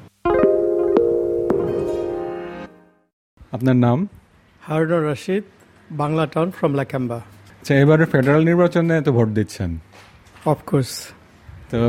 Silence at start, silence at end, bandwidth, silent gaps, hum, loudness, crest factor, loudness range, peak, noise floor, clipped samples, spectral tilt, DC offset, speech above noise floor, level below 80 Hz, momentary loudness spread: 0 s; 0 s; 15.5 kHz; 3.13-3.37 s; none; -19 LUFS; 18 dB; 5 LU; -2 dBFS; -46 dBFS; under 0.1%; -7.5 dB/octave; under 0.1%; 28 dB; -48 dBFS; 16 LU